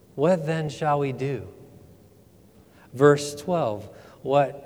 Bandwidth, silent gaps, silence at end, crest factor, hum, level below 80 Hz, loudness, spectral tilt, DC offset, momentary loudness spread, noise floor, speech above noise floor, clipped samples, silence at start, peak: 15.5 kHz; none; 0 s; 22 dB; none; -62 dBFS; -24 LUFS; -6 dB/octave; under 0.1%; 18 LU; -54 dBFS; 31 dB; under 0.1%; 0.15 s; -4 dBFS